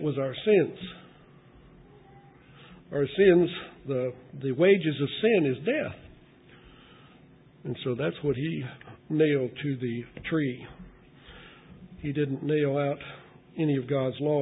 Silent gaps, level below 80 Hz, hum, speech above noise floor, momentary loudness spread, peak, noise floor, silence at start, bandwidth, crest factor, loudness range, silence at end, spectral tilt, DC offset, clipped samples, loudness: none; -60 dBFS; none; 28 dB; 20 LU; -8 dBFS; -55 dBFS; 0 s; 4 kHz; 20 dB; 7 LU; 0 s; -11 dB/octave; under 0.1%; under 0.1%; -27 LUFS